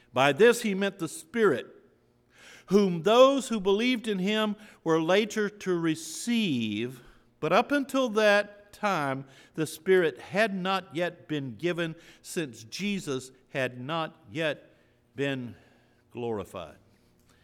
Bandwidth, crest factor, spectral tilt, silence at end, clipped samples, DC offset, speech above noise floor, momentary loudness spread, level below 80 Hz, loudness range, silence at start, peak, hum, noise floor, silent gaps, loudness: 17 kHz; 22 dB; -5 dB/octave; 0.75 s; under 0.1%; under 0.1%; 37 dB; 15 LU; -68 dBFS; 9 LU; 0.15 s; -8 dBFS; none; -64 dBFS; none; -28 LUFS